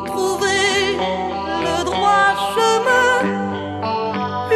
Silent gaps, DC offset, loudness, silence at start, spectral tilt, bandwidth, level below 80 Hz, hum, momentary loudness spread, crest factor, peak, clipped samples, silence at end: none; under 0.1%; -18 LUFS; 0 s; -3.5 dB/octave; 13.5 kHz; -48 dBFS; none; 8 LU; 14 dB; -4 dBFS; under 0.1%; 0 s